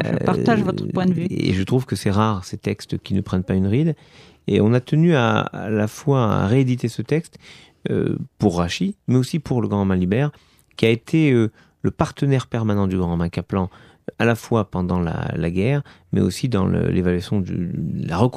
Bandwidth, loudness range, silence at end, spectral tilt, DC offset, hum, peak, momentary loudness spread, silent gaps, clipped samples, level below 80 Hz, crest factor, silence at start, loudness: 14 kHz; 3 LU; 0 s; -7.5 dB/octave; under 0.1%; none; 0 dBFS; 8 LU; none; under 0.1%; -46 dBFS; 20 dB; 0 s; -21 LUFS